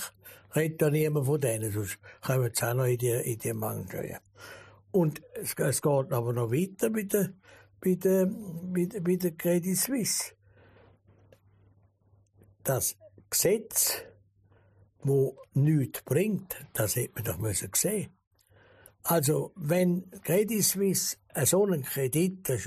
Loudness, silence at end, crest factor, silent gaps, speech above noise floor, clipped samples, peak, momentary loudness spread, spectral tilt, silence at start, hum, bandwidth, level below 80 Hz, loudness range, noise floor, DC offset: -29 LUFS; 0 s; 18 dB; 18.27-18.31 s; 37 dB; under 0.1%; -12 dBFS; 10 LU; -5 dB/octave; 0 s; none; 15.5 kHz; -64 dBFS; 4 LU; -65 dBFS; under 0.1%